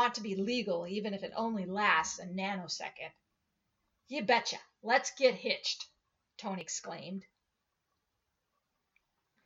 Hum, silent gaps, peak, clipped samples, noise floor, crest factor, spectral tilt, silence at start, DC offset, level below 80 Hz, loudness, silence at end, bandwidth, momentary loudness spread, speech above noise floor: none; none; -14 dBFS; under 0.1%; -84 dBFS; 22 dB; -3 dB/octave; 0 s; under 0.1%; -78 dBFS; -34 LUFS; 2.25 s; 8 kHz; 15 LU; 50 dB